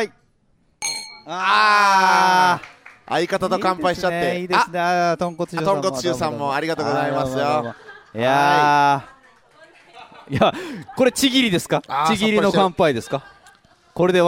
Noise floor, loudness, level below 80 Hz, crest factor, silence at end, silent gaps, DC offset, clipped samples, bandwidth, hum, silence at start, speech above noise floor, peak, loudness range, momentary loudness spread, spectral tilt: -61 dBFS; -19 LUFS; -54 dBFS; 18 dB; 0 s; none; under 0.1%; under 0.1%; 16.5 kHz; none; 0 s; 43 dB; -2 dBFS; 4 LU; 12 LU; -4 dB/octave